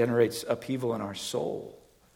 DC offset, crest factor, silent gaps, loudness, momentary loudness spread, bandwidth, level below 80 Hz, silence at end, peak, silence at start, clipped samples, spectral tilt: under 0.1%; 18 dB; none; -31 LUFS; 11 LU; 17 kHz; -66 dBFS; 0.35 s; -12 dBFS; 0 s; under 0.1%; -5 dB/octave